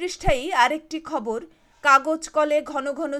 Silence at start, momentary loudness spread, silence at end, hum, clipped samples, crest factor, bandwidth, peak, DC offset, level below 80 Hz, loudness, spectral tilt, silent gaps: 0 s; 12 LU; 0 s; none; under 0.1%; 20 dB; 14 kHz; -4 dBFS; under 0.1%; -38 dBFS; -22 LUFS; -3.5 dB/octave; none